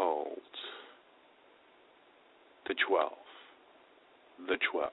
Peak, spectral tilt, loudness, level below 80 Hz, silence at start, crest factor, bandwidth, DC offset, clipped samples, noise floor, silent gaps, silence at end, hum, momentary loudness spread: -16 dBFS; 1 dB/octave; -35 LUFS; -80 dBFS; 0 s; 22 dB; 4 kHz; under 0.1%; under 0.1%; -63 dBFS; none; 0 s; none; 24 LU